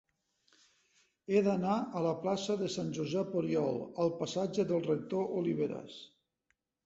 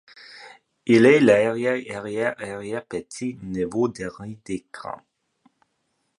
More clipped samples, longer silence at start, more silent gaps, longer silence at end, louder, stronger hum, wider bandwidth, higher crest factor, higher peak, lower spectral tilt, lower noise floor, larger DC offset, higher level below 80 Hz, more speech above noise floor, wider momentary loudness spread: neither; first, 1.3 s vs 0.3 s; neither; second, 0.8 s vs 1.2 s; second, -34 LUFS vs -22 LUFS; neither; second, 8 kHz vs 11 kHz; about the same, 18 dB vs 20 dB; second, -16 dBFS vs -4 dBFS; about the same, -6.5 dB/octave vs -6 dB/octave; first, -81 dBFS vs -73 dBFS; neither; second, -74 dBFS vs -60 dBFS; about the same, 48 dB vs 51 dB; second, 6 LU vs 22 LU